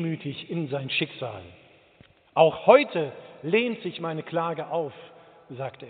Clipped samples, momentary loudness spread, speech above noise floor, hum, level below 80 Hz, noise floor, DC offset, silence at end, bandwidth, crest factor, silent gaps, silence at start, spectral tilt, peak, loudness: under 0.1%; 18 LU; 32 dB; none; -70 dBFS; -57 dBFS; under 0.1%; 0 s; 4.6 kHz; 22 dB; none; 0 s; -4 dB/octave; -4 dBFS; -25 LUFS